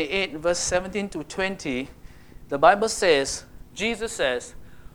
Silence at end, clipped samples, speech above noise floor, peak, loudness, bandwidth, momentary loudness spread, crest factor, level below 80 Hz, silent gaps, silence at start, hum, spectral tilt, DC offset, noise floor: 0.05 s; under 0.1%; 20 dB; -4 dBFS; -24 LUFS; 18 kHz; 14 LU; 22 dB; -48 dBFS; none; 0 s; none; -3 dB/octave; under 0.1%; -44 dBFS